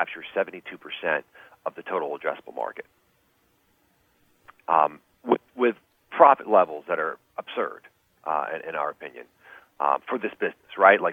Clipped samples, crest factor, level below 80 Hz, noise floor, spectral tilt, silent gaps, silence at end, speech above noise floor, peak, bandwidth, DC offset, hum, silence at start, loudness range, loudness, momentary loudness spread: under 0.1%; 24 dB; -78 dBFS; -66 dBFS; -6.5 dB/octave; none; 0 s; 42 dB; -2 dBFS; 4.7 kHz; under 0.1%; none; 0 s; 9 LU; -25 LUFS; 20 LU